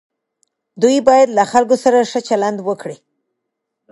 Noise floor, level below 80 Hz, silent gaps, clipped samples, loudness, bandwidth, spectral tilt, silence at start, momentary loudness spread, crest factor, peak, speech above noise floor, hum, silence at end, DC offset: -77 dBFS; -60 dBFS; none; under 0.1%; -14 LUFS; 11.5 kHz; -4.5 dB/octave; 0.75 s; 12 LU; 16 dB; 0 dBFS; 63 dB; none; 0.95 s; under 0.1%